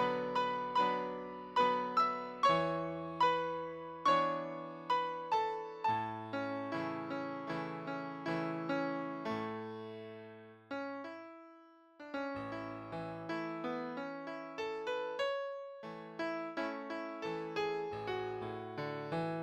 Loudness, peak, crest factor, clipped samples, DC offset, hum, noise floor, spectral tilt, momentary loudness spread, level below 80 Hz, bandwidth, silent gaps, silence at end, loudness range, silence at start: -38 LUFS; -18 dBFS; 20 dB; under 0.1%; under 0.1%; none; -61 dBFS; -6 dB/octave; 13 LU; -74 dBFS; 13 kHz; none; 0 s; 10 LU; 0 s